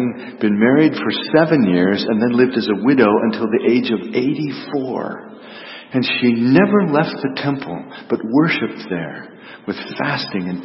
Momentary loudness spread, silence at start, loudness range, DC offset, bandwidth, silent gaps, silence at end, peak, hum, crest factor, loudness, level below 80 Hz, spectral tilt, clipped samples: 15 LU; 0 s; 5 LU; under 0.1%; 5.8 kHz; none; 0 s; 0 dBFS; none; 16 dB; -17 LUFS; -60 dBFS; -10 dB/octave; under 0.1%